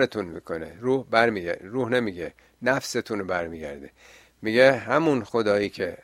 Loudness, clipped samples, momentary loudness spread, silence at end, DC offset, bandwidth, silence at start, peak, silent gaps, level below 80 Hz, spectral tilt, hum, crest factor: -24 LUFS; under 0.1%; 15 LU; 0.05 s; under 0.1%; 15.5 kHz; 0 s; -2 dBFS; none; -58 dBFS; -5 dB/octave; none; 22 dB